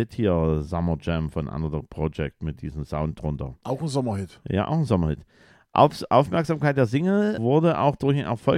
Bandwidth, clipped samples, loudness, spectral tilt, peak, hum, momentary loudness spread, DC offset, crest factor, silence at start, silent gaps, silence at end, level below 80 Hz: 11.5 kHz; under 0.1%; -24 LUFS; -8 dB/octave; -2 dBFS; none; 11 LU; under 0.1%; 22 dB; 0 s; none; 0 s; -40 dBFS